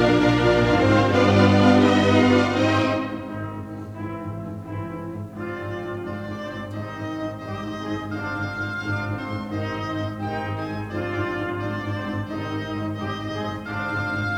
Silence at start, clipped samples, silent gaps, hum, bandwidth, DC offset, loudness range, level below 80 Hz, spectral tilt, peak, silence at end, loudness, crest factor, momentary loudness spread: 0 s; under 0.1%; none; none; 11.5 kHz; under 0.1%; 13 LU; -46 dBFS; -6.5 dB/octave; -4 dBFS; 0 s; -23 LUFS; 18 dB; 15 LU